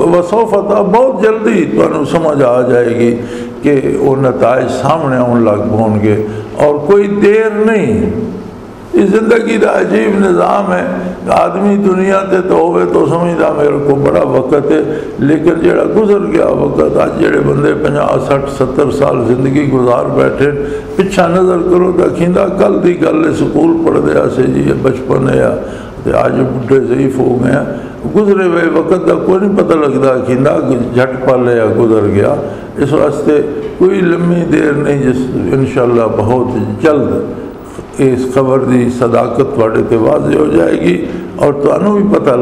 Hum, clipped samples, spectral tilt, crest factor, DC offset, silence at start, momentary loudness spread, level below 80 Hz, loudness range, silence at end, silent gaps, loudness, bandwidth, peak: none; under 0.1%; -7.5 dB/octave; 10 dB; under 0.1%; 0 s; 5 LU; -36 dBFS; 1 LU; 0 s; none; -10 LUFS; 12 kHz; 0 dBFS